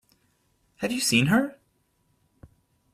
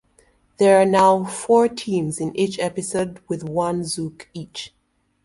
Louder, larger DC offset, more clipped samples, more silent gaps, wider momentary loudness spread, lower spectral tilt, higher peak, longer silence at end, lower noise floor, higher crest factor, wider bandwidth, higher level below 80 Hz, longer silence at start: second, -24 LUFS vs -20 LUFS; neither; neither; neither; second, 13 LU vs 18 LU; about the same, -4 dB/octave vs -5 dB/octave; second, -8 dBFS vs -2 dBFS; first, 1.45 s vs 0.55 s; first, -69 dBFS vs -59 dBFS; about the same, 20 dB vs 18 dB; first, 15.5 kHz vs 11.5 kHz; about the same, -62 dBFS vs -58 dBFS; first, 0.8 s vs 0.6 s